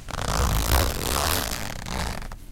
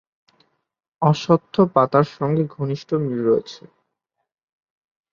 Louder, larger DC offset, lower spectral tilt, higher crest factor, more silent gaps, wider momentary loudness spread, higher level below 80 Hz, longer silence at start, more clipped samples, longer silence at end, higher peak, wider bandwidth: second, -25 LUFS vs -20 LUFS; neither; second, -3.5 dB/octave vs -8 dB/octave; about the same, 22 dB vs 20 dB; neither; about the same, 9 LU vs 7 LU; first, -30 dBFS vs -62 dBFS; second, 0 s vs 1 s; neither; second, 0 s vs 1.55 s; about the same, -4 dBFS vs -2 dBFS; first, 17 kHz vs 7.2 kHz